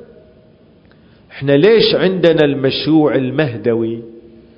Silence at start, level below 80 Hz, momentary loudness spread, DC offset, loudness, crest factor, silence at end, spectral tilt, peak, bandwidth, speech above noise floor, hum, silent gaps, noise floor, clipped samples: 1.35 s; -50 dBFS; 10 LU; under 0.1%; -13 LUFS; 16 dB; 0.4 s; -8.5 dB/octave; 0 dBFS; 6 kHz; 34 dB; none; none; -47 dBFS; under 0.1%